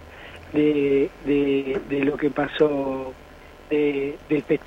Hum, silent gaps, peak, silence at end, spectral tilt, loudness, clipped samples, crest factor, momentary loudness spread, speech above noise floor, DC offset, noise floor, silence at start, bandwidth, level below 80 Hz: none; none; -6 dBFS; 0 s; -7.5 dB/octave; -23 LUFS; under 0.1%; 16 dB; 8 LU; 19 dB; under 0.1%; -42 dBFS; 0 s; 7.8 kHz; -50 dBFS